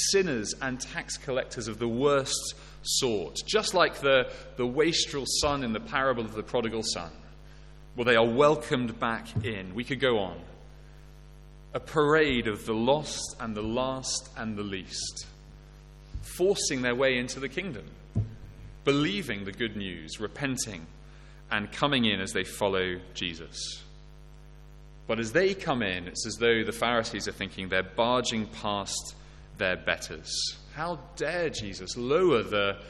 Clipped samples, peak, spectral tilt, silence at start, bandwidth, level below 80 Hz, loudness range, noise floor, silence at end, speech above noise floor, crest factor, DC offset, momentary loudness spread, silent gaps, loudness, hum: under 0.1%; -8 dBFS; -3.5 dB/octave; 0 s; 13.5 kHz; -50 dBFS; 5 LU; -49 dBFS; 0 s; 20 dB; 22 dB; under 0.1%; 12 LU; none; -29 LUFS; none